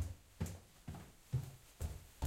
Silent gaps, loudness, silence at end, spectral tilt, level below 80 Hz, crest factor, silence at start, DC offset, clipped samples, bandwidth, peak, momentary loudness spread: none; -48 LUFS; 0 s; -6 dB/octave; -54 dBFS; 18 dB; 0 s; under 0.1%; under 0.1%; 16.5 kHz; -28 dBFS; 10 LU